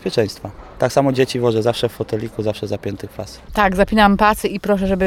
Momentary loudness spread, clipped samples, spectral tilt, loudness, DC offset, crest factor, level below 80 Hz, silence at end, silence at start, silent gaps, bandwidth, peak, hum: 15 LU; under 0.1%; -5.5 dB/octave; -18 LUFS; under 0.1%; 16 dB; -36 dBFS; 0 s; 0 s; none; 16.5 kHz; 0 dBFS; none